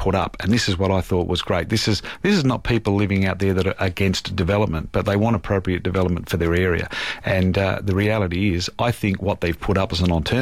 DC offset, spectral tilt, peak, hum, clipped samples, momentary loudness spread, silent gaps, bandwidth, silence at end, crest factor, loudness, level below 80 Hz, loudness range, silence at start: 0.5%; -6 dB/octave; -6 dBFS; none; under 0.1%; 3 LU; none; 15 kHz; 0 s; 14 dB; -21 LUFS; -38 dBFS; 1 LU; 0 s